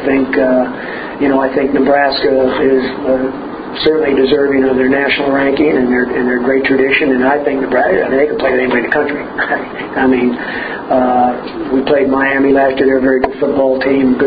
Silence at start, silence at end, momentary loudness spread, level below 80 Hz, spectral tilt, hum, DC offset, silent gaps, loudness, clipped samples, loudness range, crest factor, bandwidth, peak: 0 s; 0 s; 6 LU; -42 dBFS; -9 dB/octave; none; under 0.1%; none; -13 LUFS; under 0.1%; 2 LU; 12 dB; 5 kHz; 0 dBFS